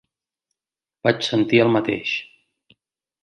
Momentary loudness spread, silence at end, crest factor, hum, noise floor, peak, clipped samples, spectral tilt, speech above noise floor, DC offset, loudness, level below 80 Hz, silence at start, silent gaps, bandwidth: 9 LU; 1 s; 20 dB; none; under -90 dBFS; -2 dBFS; under 0.1%; -6 dB/octave; over 71 dB; under 0.1%; -20 LUFS; -64 dBFS; 1.05 s; none; 9 kHz